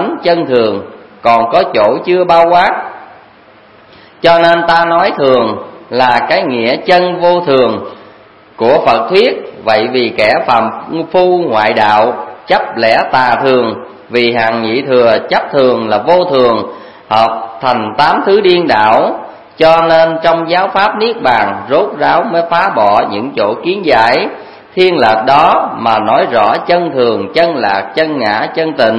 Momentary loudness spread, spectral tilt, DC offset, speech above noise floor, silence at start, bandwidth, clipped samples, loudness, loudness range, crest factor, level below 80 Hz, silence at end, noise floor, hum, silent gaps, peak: 7 LU; -6 dB/octave; 0.3%; 31 dB; 0 s; 10 kHz; 0.4%; -10 LUFS; 2 LU; 10 dB; -48 dBFS; 0 s; -40 dBFS; none; none; 0 dBFS